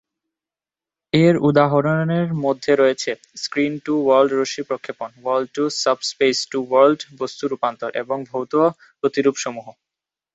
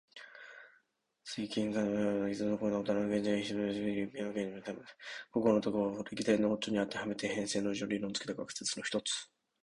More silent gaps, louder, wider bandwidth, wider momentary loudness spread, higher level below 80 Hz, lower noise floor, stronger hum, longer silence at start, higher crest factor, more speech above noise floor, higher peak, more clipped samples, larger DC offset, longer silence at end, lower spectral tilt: neither; first, -20 LUFS vs -35 LUFS; second, 8.2 kHz vs 11 kHz; second, 12 LU vs 15 LU; first, -60 dBFS vs -70 dBFS; first, under -90 dBFS vs -75 dBFS; neither; first, 1.15 s vs 0.15 s; about the same, 18 dB vs 20 dB; first, over 71 dB vs 40 dB; first, -2 dBFS vs -14 dBFS; neither; neither; first, 0.65 s vs 0.4 s; about the same, -5.5 dB/octave vs -4.5 dB/octave